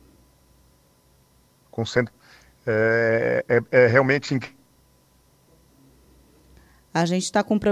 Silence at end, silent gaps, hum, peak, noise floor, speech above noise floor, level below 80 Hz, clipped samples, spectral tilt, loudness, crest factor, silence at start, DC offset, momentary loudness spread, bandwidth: 0 s; none; 60 Hz at -50 dBFS; -2 dBFS; -59 dBFS; 39 dB; -56 dBFS; under 0.1%; -5.5 dB/octave; -21 LUFS; 22 dB; 1.75 s; under 0.1%; 15 LU; 14 kHz